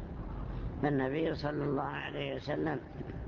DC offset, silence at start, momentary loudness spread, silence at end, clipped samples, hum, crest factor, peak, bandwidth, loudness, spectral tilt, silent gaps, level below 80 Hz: under 0.1%; 0 s; 10 LU; 0 s; under 0.1%; none; 18 dB; -18 dBFS; 7 kHz; -36 LUFS; -5.5 dB/octave; none; -46 dBFS